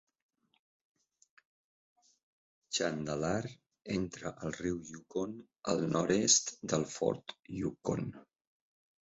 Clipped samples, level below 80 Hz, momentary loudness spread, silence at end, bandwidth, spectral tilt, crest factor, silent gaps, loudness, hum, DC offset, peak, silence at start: under 0.1%; -64 dBFS; 15 LU; 0.85 s; 8 kHz; -4.5 dB/octave; 24 dB; none; -34 LUFS; none; under 0.1%; -12 dBFS; 2.7 s